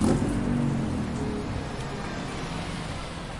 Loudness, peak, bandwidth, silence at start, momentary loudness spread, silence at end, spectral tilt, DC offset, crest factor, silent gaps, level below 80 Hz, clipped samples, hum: -30 LUFS; -10 dBFS; 11.5 kHz; 0 s; 7 LU; 0 s; -6 dB/octave; under 0.1%; 18 dB; none; -40 dBFS; under 0.1%; none